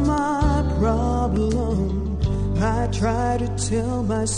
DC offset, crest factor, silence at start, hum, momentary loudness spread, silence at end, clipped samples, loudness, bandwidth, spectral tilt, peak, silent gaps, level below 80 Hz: under 0.1%; 14 dB; 0 s; none; 3 LU; 0 s; under 0.1%; -22 LUFS; 10.5 kHz; -6.5 dB/octave; -8 dBFS; none; -26 dBFS